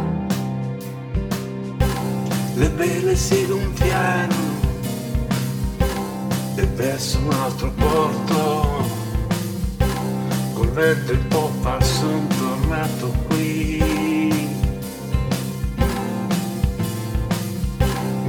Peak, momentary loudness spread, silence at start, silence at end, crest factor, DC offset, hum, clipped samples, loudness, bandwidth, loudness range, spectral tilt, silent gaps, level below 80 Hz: -4 dBFS; 7 LU; 0 s; 0 s; 16 dB; under 0.1%; none; under 0.1%; -22 LUFS; 19.5 kHz; 2 LU; -5.5 dB/octave; none; -28 dBFS